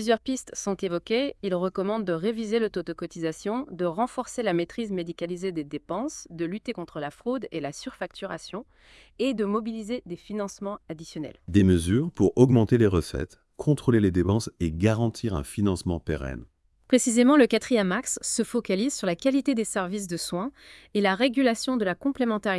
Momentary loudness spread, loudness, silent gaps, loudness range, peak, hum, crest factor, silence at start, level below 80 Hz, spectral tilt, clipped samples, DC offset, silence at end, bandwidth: 14 LU; -26 LUFS; none; 9 LU; -6 dBFS; none; 20 dB; 0 s; -50 dBFS; -5.5 dB/octave; under 0.1%; under 0.1%; 0 s; 12 kHz